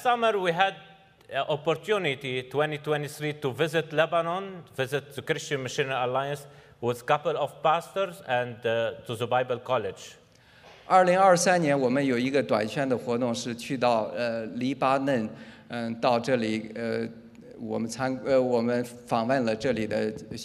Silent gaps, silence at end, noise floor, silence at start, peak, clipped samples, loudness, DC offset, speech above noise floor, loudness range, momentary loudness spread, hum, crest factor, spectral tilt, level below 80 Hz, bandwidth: none; 0 s; -54 dBFS; 0 s; -6 dBFS; under 0.1%; -27 LUFS; under 0.1%; 28 dB; 5 LU; 10 LU; none; 20 dB; -5 dB/octave; -68 dBFS; 15.5 kHz